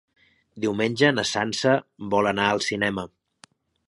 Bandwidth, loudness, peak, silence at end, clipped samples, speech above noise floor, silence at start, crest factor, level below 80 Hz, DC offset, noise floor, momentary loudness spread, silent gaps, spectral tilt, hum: 11.5 kHz; -23 LUFS; -4 dBFS; 0.8 s; under 0.1%; 33 dB; 0.55 s; 22 dB; -58 dBFS; under 0.1%; -57 dBFS; 8 LU; none; -4.5 dB/octave; none